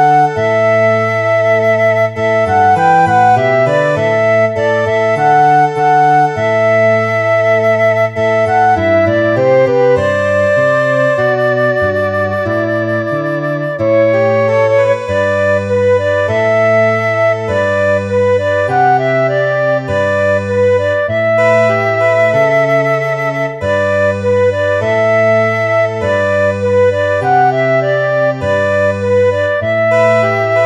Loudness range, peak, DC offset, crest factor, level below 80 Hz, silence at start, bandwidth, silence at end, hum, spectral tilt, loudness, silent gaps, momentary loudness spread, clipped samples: 2 LU; 0 dBFS; under 0.1%; 12 dB; -48 dBFS; 0 s; 10 kHz; 0 s; none; -6.5 dB/octave; -12 LUFS; none; 4 LU; under 0.1%